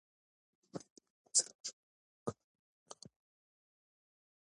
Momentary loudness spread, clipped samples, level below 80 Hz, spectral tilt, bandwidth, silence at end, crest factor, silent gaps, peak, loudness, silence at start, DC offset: 23 LU; under 0.1%; -82 dBFS; -1.5 dB/octave; 11 kHz; 1.5 s; 30 dB; 0.90-0.96 s, 1.10-1.25 s, 1.55-1.64 s, 1.73-2.26 s, 2.44-2.86 s; -16 dBFS; -37 LUFS; 0.75 s; under 0.1%